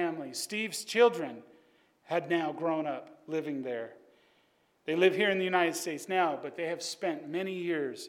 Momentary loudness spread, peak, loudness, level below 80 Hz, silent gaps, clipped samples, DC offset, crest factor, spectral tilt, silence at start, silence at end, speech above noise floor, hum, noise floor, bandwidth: 13 LU; -12 dBFS; -31 LUFS; -86 dBFS; none; under 0.1%; under 0.1%; 20 dB; -4 dB/octave; 0 s; 0 s; 39 dB; none; -70 dBFS; 17 kHz